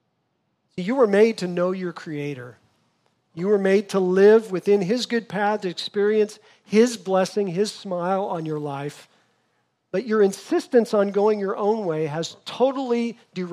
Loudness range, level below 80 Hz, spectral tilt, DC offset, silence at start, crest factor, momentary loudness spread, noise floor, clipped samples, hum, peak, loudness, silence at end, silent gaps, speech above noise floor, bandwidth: 4 LU; -78 dBFS; -5.5 dB/octave; under 0.1%; 0.75 s; 18 dB; 12 LU; -72 dBFS; under 0.1%; none; -4 dBFS; -22 LUFS; 0 s; none; 51 dB; 12.5 kHz